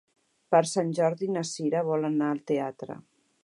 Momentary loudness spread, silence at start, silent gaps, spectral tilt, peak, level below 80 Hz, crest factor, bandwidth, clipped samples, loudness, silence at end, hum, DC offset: 13 LU; 0.5 s; none; -5.5 dB/octave; -8 dBFS; -78 dBFS; 20 dB; 11.5 kHz; under 0.1%; -27 LUFS; 0.45 s; none; under 0.1%